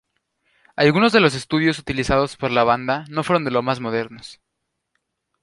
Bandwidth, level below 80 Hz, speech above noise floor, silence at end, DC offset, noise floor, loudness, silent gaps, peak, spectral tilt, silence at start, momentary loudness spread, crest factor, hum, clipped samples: 11.5 kHz; -46 dBFS; 58 dB; 1.1 s; under 0.1%; -77 dBFS; -19 LUFS; none; -2 dBFS; -5.5 dB/octave; 0.8 s; 11 LU; 20 dB; none; under 0.1%